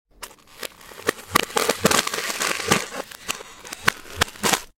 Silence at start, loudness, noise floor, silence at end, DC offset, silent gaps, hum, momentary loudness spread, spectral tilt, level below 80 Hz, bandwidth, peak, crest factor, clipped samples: 0.2 s; -23 LUFS; -43 dBFS; 0.1 s; under 0.1%; none; none; 17 LU; -2 dB/octave; -50 dBFS; 17 kHz; 0 dBFS; 26 dB; under 0.1%